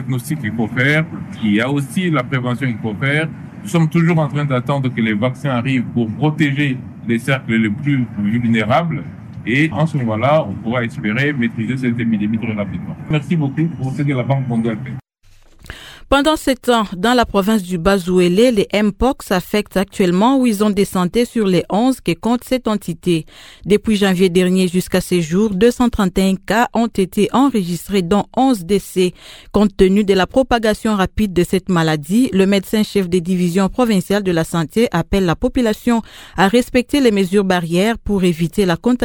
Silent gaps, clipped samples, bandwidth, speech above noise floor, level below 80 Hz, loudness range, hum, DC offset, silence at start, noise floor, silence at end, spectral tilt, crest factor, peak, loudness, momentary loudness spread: none; under 0.1%; 18.5 kHz; 32 dB; -38 dBFS; 3 LU; none; under 0.1%; 0 s; -47 dBFS; 0 s; -6 dB/octave; 16 dB; 0 dBFS; -16 LUFS; 7 LU